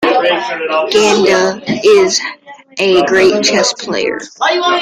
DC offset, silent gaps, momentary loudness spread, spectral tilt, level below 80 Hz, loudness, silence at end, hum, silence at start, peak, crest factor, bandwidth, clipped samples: under 0.1%; none; 8 LU; -3 dB/octave; -52 dBFS; -12 LUFS; 0 s; none; 0 s; 0 dBFS; 12 dB; 12 kHz; under 0.1%